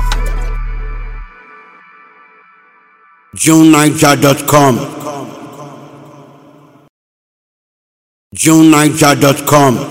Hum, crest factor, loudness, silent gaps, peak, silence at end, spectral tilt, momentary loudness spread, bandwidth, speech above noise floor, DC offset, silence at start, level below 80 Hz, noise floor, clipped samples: none; 12 dB; -9 LUFS; 6.89-8.31 s; 0 dBFS; 0 s; -4.5 dB/octave; 24 LU; over 20 kHz; 39 dB; under 0.1%; 0 s; -26 dBFS; -46 dBFS; 1%